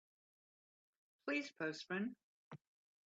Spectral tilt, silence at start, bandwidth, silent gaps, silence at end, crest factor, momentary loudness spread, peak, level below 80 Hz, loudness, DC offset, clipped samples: -5 dB/octave; 1.25 s; 8 kHz; 2.23-2.51 s; 0.5 s; 20 dB; 19 LU; -28 dBFS; under -90 dBFS; -44 LUFS; under 0.1%; under 0.1%